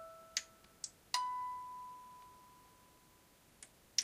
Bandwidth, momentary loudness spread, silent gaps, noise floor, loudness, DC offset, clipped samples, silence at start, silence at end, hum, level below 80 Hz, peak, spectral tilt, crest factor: 15.5 kHz; 25 LU; none; -67 dBFS; -43 LUFS; under 0.1%; under 0.1%; 0 s; 0 s; none; -78 dBFS; -18 dBFS; 1.5 dB/octave; 28 dB